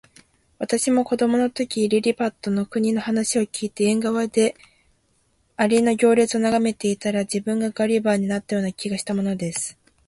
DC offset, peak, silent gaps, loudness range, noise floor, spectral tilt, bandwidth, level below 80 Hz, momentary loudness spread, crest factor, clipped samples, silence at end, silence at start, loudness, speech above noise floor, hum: under 0.1%; -6 dBFS; none; 3 LU; -65 dBFS; -4.5 dB/octave; 11.5 kHz; -60 dBFS; 7 LU; 16 dB; under 0.1%; 0.35 s; 0.6 s; -22 LUFS; 44 dB; none